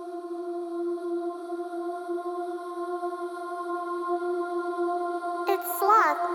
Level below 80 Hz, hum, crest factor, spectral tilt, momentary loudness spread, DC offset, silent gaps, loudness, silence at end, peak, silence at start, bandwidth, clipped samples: -84 dBFS; none; 20 dB; -2 dB/octave; 13 LU; under 0.1%; none; -29 LUFS; 0 s; -8 dBFS; 0 s; 19.5 kHz; under 0.1%